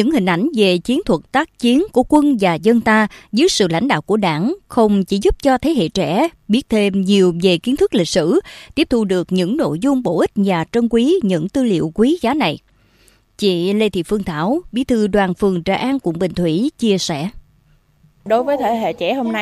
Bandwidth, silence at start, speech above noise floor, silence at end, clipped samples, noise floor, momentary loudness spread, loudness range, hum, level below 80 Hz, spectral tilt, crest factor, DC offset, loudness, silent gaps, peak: 14.5 kHz; 0 s; 39 dB; 0 s; under 0.1%; -54 dBFS; 5 LU; 4 LU; none; -42 dBFS; -5.5 dB/octave; 16 dB; under 0.1%; -16 LUFS; none; 0 dBFS